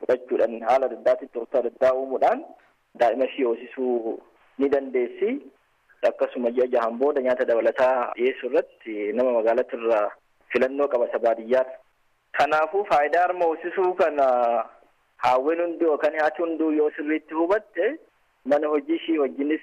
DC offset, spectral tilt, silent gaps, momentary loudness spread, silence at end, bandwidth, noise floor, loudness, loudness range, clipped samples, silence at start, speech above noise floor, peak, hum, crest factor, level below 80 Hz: under 0.1%; -5.5 dB/octave; none; 7 LU; 0 s; 9.2 kHz; -66 dBFS; -24 LUFS; 3 LU; under 0.1%; 0 s; 43 dB; -10 dBFS; none; 12 dB; -68 dBFS